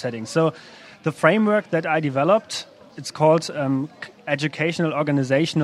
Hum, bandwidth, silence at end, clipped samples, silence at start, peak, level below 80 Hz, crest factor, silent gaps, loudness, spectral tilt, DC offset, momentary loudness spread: none; 13 kHz; 0 s; under 0.1%; 0 s; 0 dBFS; -68 dBFS; 22 dB; none; -21 LUFS; -6 dB/octave; under 0.1%; 14 LU